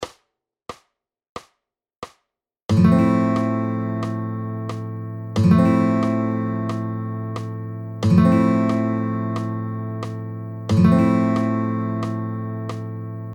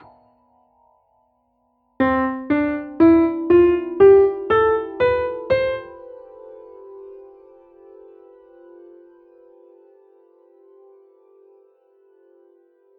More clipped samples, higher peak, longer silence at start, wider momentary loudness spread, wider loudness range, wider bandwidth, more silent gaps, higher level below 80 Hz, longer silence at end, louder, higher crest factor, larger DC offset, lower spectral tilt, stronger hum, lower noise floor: neither; about the same, -4 dBFS vs -4 dBFS; second, 0 s vs 2 s; second, 21 LU vs 28 LU; second, 2 LU vs 11 LU; first, 9.8 kHz vs 4.6 kHz; first, 1.29-1.36 s, 1.96-2.02 s, 2.65-2.69 s vs none; about the same, -50 dBFS vs -50 dBFS; second, 0 s vs 5.8 s; second, -21 LUFS vs -17 LUFS; about the same, 18 dB vs 18 dB; neither; about the same, -8.5 dB/octave vs -9 dB/octave; neither; first, -79 dBFS vs -66 dBFS